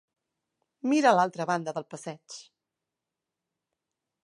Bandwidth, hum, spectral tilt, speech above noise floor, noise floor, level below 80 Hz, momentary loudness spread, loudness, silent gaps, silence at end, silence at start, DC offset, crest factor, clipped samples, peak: 11.5 kHz; none; -5 dB/octave; 61 dB; -88 dBFS; -84 dBFS; 21 LU; -26 LUFS; none; 1.85 s; 0.85 s; under 0.1%; 24 dB; under 0.1%; -8 dBFS